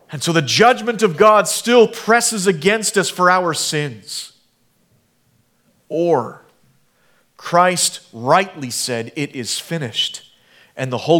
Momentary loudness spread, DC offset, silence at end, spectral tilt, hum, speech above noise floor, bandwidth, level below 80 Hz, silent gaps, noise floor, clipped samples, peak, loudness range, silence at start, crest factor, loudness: 14 LU; under 0.1%; 0 s; -3.5 dB/octave; none; 44 dB; 18.5 kHz; -66 dBFS; none; -60 dBFS; under 0.1%; 0 dBFS; 10 LU; 0.1 s; 18 dB; -16 LUFS